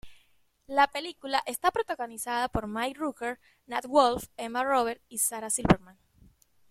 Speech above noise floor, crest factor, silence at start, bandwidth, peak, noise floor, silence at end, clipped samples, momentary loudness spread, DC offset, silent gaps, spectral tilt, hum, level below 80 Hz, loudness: 37 dB; 26 dB; 0.05 s; 16.5 kHz; -4 dBFS; -66 dBFS; 0.8 s; under 0.1%; 11 LU; under 0.1%; none; -3.5 dB/octave; none; -52 dBFS; -29 LUFS